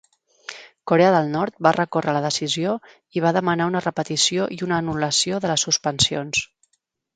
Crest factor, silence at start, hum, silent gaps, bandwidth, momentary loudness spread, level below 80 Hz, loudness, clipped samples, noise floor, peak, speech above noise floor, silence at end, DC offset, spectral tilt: 22 dB; 0.5 s; none; none; 9.6 kHz; 12 LU; -56 dBFS; -21 LUFS; under 0.1%; -72 dBFS; 0 dBFS; 51 dB; 0.7 s; under 0.1%; -3.5 dB/octave